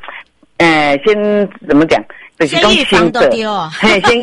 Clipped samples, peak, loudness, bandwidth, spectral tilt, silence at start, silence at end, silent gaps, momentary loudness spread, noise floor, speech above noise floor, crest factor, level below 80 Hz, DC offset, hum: under 0.1%; 0 dBFS; -11 LUFS; 11.5 kHz; -4.5 dB/octave; 0 s; 0 s; none; 7 LU; -34 dBFS; 23 dB; 12 dB; -38 dBFS; under 0.1%; none